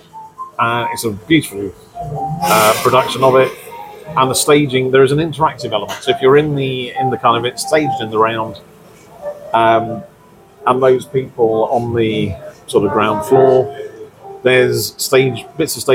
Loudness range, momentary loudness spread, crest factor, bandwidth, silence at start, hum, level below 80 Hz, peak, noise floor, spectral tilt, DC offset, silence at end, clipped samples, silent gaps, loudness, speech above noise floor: 3 LU; 16 LU; 14 dB; 17 kHz; 0.15 s; none; -48 dBFS; 0 dBFS; -44 dBFS; -4.5 dB/octave; under 0.1%; 0 s; under 0.1%; none; -14 LUFS; 30 dB